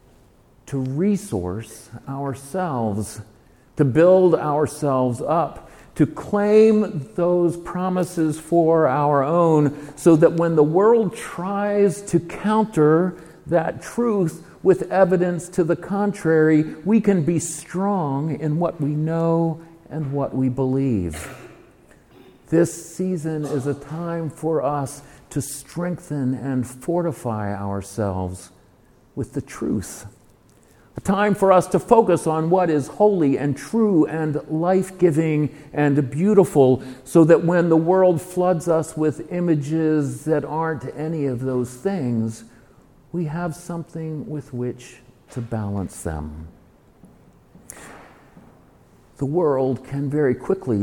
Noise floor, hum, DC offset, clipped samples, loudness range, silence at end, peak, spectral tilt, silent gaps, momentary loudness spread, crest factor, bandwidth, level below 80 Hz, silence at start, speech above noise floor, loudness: -54 dBFS; none; under 0.1%; under 0.1%; 11 LU; 0 s; 0 dBFS; -7.5 dB/octave; none; 14 LU; 20 dB; 17.5 kHz; -50 dBFS; 0.65 s; 34 dB; -21 LUFS